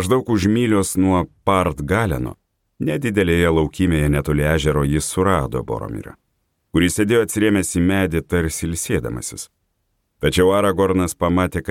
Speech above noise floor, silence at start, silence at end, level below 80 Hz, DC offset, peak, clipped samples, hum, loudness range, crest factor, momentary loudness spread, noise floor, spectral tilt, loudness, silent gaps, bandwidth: 51 dB; 0 s; 0 s; -34 dBFS; under 0.1%; -2 dBFS; under 0.1%; none; 2 LU; 16 dB; 10 LU; -70 dBFS; -5.5 dB/octave; -19 LUFS; none; 17 kHz